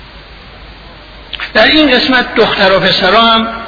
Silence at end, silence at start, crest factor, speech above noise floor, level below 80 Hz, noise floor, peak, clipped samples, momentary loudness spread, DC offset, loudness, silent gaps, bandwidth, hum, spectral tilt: 0 s; 0 s; 10 dB; 24 dB; -36 dBFS; -33 dBFS; 0 dBFS; 0.3%; 7 LU; under 0.1%; -8 LUFS; none; 5.4 kHz; none; -5 dB/octave